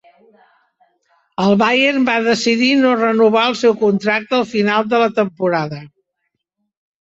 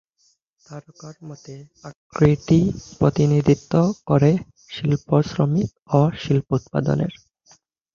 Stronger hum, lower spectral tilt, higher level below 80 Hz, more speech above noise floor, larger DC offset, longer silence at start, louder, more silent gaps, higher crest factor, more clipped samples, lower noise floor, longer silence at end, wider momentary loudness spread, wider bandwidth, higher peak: neither; second, -5 dB/octave vs -8 dB/octave; second, -60 dBFS vs -48 dBFS; first, 59 dB vs 45 dB; neither; first, 1.4 s vs 0.7 s; first, -15 LUFS vs -20 LUFS; second, none vs 1.96-2.10 s, 5.82-5.86 s; second, 14 dB vs 20 dB; neither; first, -74 dBFS vs -65 dBFS; first, 1.15 s vs 0.8 s; second, 6 LU vs 22 LU; first, 8 kHz vs 7.2 kHz; about the same, -2 dBFS vs -2 dBFS